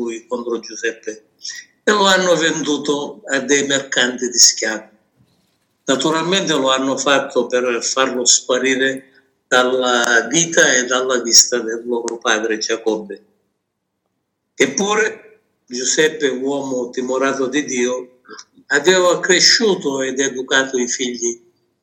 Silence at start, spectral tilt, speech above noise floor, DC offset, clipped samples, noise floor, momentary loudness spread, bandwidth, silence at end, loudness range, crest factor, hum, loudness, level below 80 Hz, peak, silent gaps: 0 s; -1.5 dB/octave; 57 dB; under 0.1%; under 0.1%; -74 dBFS; 14 LU; 17 kHz; 0.45 s; 6 LU; 18 dB; none; -16 LUFS; -72 dBFS; 0 dBFS; none